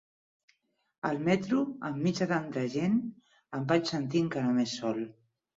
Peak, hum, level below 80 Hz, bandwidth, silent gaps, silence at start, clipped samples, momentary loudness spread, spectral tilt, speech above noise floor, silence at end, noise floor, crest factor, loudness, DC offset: -12 dBFS; none; -70 dBFS; 7.8 kHz; none; 1.05 s; under 0.1%; 9 LU; -6 dB/octave; 42 dB; 0.45 s; -71 dBFS; 18 dB; -31 LUFS; under 0.1%